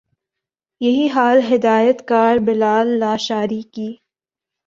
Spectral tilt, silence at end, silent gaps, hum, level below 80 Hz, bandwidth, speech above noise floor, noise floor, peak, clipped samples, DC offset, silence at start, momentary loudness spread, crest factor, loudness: -5.5 dB/octave; 0.75 s; none; none; -60 dBFS; 7.6 kHz; 71 dB; -86 dBFS; -2 dBFS; under 0.1%; under 0.1%; 0.8 s; 11 LU; 16 dB; -16 LUFS